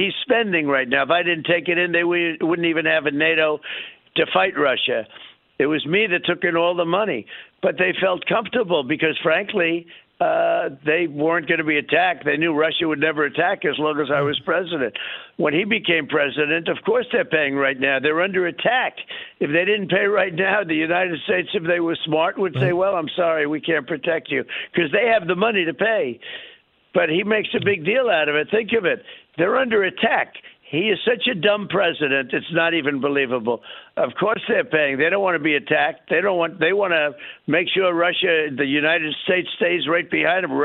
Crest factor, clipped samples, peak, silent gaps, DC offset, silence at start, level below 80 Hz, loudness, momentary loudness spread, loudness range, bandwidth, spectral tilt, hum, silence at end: 18 dB; under 0.1%; -2 dBFS; none; under 0.1%; 0 s; -64 dBFS; -20 LUFS; 6 LU; 2 LU; 4.2 kHz; -8.5 dB/octave; none; 0 s